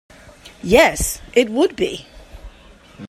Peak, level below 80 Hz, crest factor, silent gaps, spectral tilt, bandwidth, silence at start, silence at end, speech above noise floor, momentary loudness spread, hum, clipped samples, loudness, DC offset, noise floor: 0 dBFS; -36 dBFS; 20 dB; none; -3.5 dB/octave; 16 kHz; 0.45 s; 0 s; 29 dB; 14 LU; none; under 0.1%; -17 LUFS; under 0.1%; -45 dBFS